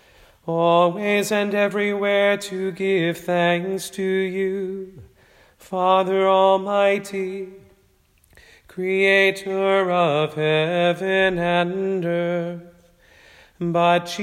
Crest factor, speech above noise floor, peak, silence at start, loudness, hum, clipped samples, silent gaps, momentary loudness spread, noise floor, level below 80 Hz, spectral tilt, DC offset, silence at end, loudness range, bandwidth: 16 dB; 39 dB; -4 dBFS; 0.45 s; -20 LUFS; none; under 0.1%; none; 12 LU; -60 dBFS; -60 dBFS; -5.5 dB/octave; under 0.1%; 0 s; 3 LU; 16 kHz